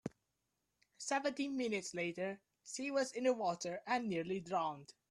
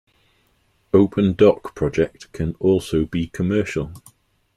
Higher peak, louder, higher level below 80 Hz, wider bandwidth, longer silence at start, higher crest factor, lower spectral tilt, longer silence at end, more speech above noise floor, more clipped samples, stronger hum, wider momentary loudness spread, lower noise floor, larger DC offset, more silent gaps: second, -22 dBFS vs -2 dBFS; second, -39 LUFS vs -20 LUFS; second, -80 dBFS vs -44 dBFS; about the same, 12.5 kHz vs 13.5 kHz; second, 0.05 s vs 0.95 s; about the same, 18 dB vs 18 dB; second, -4 dB/octave vs -7.5 dB/octave; second, 0.2 s vs 0.6 s; about the same, 47 dB vs 44 dB; neither; neither; about the same, 11 LU vs 11 LU; first, -86 dBFS vs -63 dBFS; neither; neither